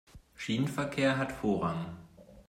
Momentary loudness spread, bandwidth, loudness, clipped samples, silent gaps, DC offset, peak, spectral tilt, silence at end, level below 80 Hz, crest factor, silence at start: 13 LU; 16 kHz; -32 LUFS; under 0.1%; none; under 0.1%; -16 dBFS; -6 dB/octave; 0.05 s; -58 dBFS; 18 dB; 0.15 s